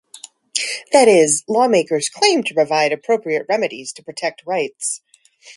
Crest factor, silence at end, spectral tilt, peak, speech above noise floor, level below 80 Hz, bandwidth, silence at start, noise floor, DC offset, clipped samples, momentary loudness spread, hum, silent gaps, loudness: 18 dB; 0.05 s; -2.5 dB/octave; 0 dBFS; 30 dB; -68 dBFS; 11.5 kHz; 0.55 s; -46 dBFS; under 0.1%; under 0.1%; 13 LU; none; none; -17 LUFS